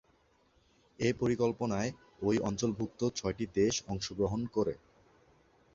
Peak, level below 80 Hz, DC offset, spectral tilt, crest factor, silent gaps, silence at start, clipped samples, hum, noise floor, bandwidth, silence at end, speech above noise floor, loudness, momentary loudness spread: -16 dBFS; -58 dBFS; under 0.1%; -5.5 dB/octave; 18 dB; none; 1 s; under 0.1%; none; -69 dBFS; 7.8 kHz; 1 s; 37 dB; -33 LUFS; 6 LU